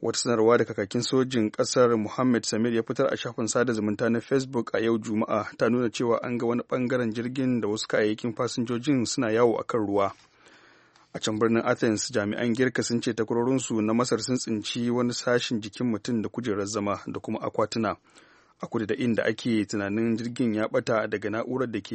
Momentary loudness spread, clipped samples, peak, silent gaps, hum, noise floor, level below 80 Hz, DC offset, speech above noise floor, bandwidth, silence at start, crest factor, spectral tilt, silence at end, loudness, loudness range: 6 LU; under 0.1%; -8 dBFS; none; none; -58 dBFS; -66 dBFS; under 0.1%; 32 dB; 8.8 kHz; 0 s; 18 dB; -5 dB/octave; 0 s; -26 LUFS; 3 LU